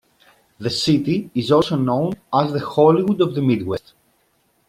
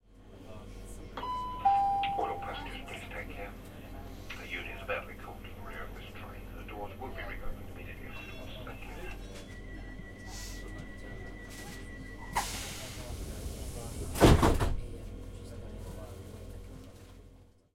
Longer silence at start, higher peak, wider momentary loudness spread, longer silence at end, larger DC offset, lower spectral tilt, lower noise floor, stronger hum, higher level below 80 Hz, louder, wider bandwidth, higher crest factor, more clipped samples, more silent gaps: first, 0.6 s vs 0.05 s; first, -2 dBFS vs -8 dBFS; second, 9 LU vs 19 LU; first, 0.9 s vs 0.25 s; neither; first, -6.5 dB/octave vs -5 dB/octave; first, -63 dBFS vs -57 dBFS; neither; second, -56 dBFS vs -42 dBFS; first, -19 LUFS vs -36 LUFS; second, 14.5 kHz vs 16.5 kHz; second, 18 dB vs 28 dB; neither; neither